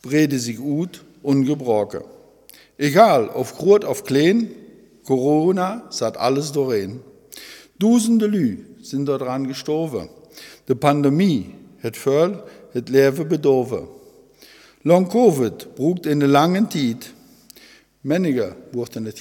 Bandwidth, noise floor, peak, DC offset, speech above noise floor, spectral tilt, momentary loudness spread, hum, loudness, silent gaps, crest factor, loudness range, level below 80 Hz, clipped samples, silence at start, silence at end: 18 kHz; -49 dBFS; 0 dBFS; under 0.1%; 31 dB; -6 dB/octave; 15 LU; none; -19 LUFS; none; 20 dB; 3 LU; -62 dBFS; under 0.1%; 0.05 s; 0 s